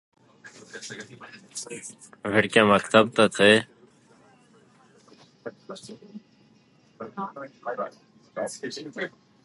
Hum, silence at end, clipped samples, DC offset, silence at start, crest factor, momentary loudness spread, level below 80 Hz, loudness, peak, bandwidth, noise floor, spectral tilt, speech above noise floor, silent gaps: none; 0.35 s; under 0.1%; under 0.1%; 0.45 s; 26 dB; 24 LU; -66 dBFS; -23 LUFS; -2 dBFS; 11.5 kHz; -59 dBFS; -4 dB/octave; 34 dB; none